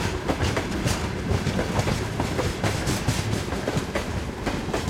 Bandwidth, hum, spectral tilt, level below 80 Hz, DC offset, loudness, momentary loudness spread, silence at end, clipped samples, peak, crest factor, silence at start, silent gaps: 16.5 kHz; none; -5 dB/octave; -36 dBFS; under 0.1%; -26 LUFS; 3 LU; 0 s; under 0.1%; -10 dBFS; 16 dB; 0 s; none